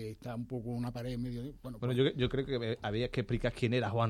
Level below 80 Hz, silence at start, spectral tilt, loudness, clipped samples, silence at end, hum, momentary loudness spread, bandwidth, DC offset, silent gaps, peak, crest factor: -52 dBFS; 0 s; -7.5 dB/octave; -35 LUFS; under 0.1%; 0 s; none; 10 LU; 13.5 kHz; under 0.1%; none; -16 dBFS; 18 dB